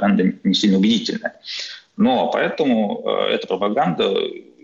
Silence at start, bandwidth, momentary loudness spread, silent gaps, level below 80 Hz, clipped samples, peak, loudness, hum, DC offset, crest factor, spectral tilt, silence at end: 0 s; 7.6 kHz; 11 LU; none; -62 dBFS; under 0.1%; -8 dBFS; -19 LUFS; none; under 0.1%; 12 dB; -5.5 dB/octave; 0.25 s